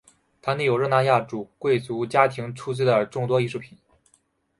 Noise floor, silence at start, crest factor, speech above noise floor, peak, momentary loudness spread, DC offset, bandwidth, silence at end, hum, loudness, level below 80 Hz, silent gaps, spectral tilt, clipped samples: -66 dBFS; 0.45 s; 22 dB; 43 dB; -2 dBFS; 11 LU; under 0.1%; 11.5 kHz; 0.95 s; none; -23 LUFS; -64 dBFS; none; -6.5 dB/octave; under 0.1%